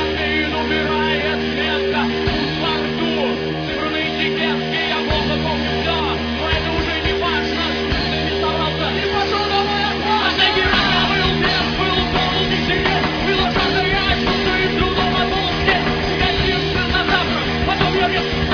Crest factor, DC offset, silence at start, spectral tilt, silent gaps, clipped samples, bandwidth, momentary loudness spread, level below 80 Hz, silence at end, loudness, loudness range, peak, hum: 16 dB; under 0.1%; 0 s; -5.5 dB/octave; none; under 0.1%; 5.4 kHz; 3 LU; -30 dBFS; 0 s; -17 LUFS; 3 LU; -2 dBFS; none